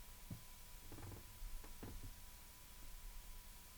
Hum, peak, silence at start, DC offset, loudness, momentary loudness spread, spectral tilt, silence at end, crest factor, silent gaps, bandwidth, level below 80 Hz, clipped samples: none; -38 dBFS; 0 s; under 0.1%; -56 LUFS; 3 LU; -3.5 dB/octave; 0 s; 16 dB; none; over 20 kHz; -56 dBFS; under 0.1%